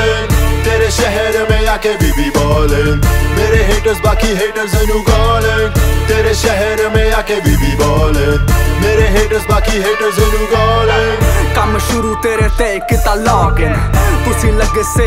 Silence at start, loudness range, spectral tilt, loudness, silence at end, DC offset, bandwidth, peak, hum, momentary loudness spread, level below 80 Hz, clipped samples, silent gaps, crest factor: 0 s; 1 LU; -5 dB/octave; -12 LUFS; 0 s; under 0.1%; 16.5 kHz; 0 dBFS; none; 2 LU; -16 dBFS; under 0.1%; none; 10 dB